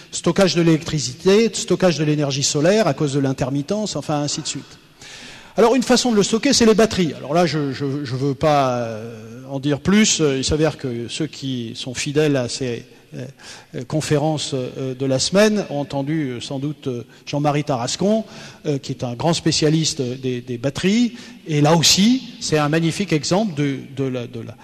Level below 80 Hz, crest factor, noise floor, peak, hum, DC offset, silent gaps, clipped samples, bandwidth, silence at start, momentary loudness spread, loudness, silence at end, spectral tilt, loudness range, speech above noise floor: -48 dBFS; 14 dB; -39 dBFS; -4 dBFS; none; under 0.1%; none; under 0.1%; 13.5 kHz; 0 s; 13 LU; -19 LUFS; 0.1 s; -4.5 dB/octave; 5 LU; 20 dB